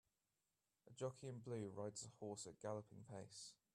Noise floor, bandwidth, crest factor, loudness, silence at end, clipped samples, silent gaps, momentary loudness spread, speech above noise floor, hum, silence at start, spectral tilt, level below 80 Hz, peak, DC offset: under -90 dBFS; 13.5 kHz; 20 dB; -53 LUFS; 0.2 s; under 0.1%; none; 7 LU; over 38 dB; none; 0.85 s; -5 dB/octave; -86 dBFS; -34 dBFS; under 0.1%